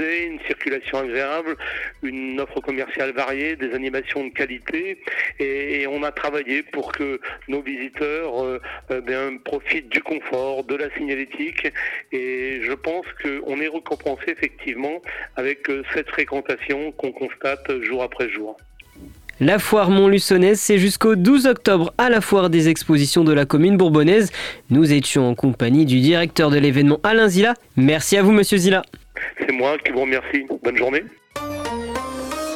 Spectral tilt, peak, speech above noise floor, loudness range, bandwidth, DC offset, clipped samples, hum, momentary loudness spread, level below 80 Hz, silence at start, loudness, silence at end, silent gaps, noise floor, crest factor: -5 dB/octave; -4 dBFS; 24 dB; 10 LU; 16.5 kHz; under 0.1%; under 0.1%; none; 13 LU; -50 dBFS; 0 s; -20 LUFS; 0 s; none; -43 dBFS; 16 dB